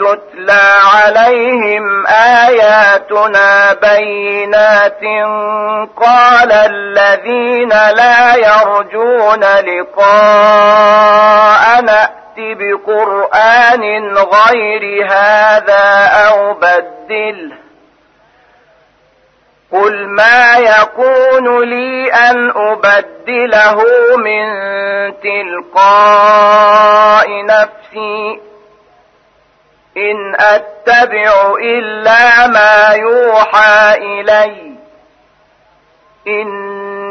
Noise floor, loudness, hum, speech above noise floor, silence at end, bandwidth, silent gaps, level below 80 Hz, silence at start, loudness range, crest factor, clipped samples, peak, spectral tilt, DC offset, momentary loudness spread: -50 dBFS; -7 LUFS; none; 43 dB; 0 s; 6.6 kHz; none; -52 dBFS; 0 s; 6 LU; 8 dB; 0.1%; 0 dBFS; -3 dB/octave; under 0.1%; 11 LU